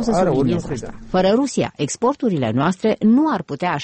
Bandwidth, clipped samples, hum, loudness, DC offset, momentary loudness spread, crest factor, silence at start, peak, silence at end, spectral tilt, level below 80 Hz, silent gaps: 8.8 kHz; under 0.1%; none; -19 LUFS; under 0.1%; 7 LU; 12 dB; 0 s; -6 dBFS; 0 s; -6 dB/octave; -44 dBFS; none